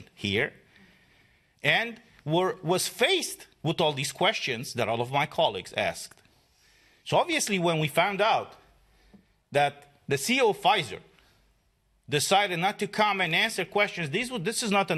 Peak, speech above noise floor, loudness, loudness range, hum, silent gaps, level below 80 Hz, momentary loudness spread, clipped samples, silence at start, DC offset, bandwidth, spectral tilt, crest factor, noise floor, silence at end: -6 dBFS; 42 dB; -26 LUFS; 2 LU; none; none; -66 dBFS; 9 LU; under 0.1%; 0 s; under 0.1%; 13 kHz; -3.5 dB/octave; 22 dB; -69 dBFS; 0 s